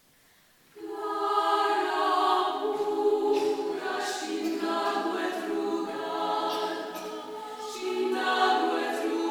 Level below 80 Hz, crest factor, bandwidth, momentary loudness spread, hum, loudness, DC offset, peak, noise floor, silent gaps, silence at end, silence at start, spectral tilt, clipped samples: -80 dBFS; 18 dB; 19 kHz; 12 LU; none; -28 LUFS; under 0.1%; -12 dBFS; -61 dBFS; none; 0 s; 0.75 s; -2.5 dB/octave; under 0.1%